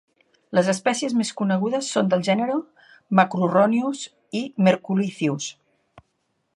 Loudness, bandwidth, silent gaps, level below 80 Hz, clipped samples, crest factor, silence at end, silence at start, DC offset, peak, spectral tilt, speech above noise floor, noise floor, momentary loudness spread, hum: -22 LUFS; 11.5 kHz; none; -72 dBFS; under 0.1%; 22 dB; 1.05 s; 0.5 s; under 0.1%; -2 dBFS; -5.5 dB/octave; 51 dB; -72 dBFS; 10 LU; none